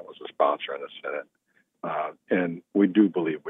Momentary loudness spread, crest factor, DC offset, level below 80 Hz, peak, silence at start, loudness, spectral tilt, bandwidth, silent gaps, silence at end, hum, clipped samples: 14 LU; 18 dB; under 0.1%; -86 dBFS; -8 dBFS; 0 s; -26 LUFS; -9.5 dB/octave; 3.8 kHz; none; 0 s; none; under 0.1%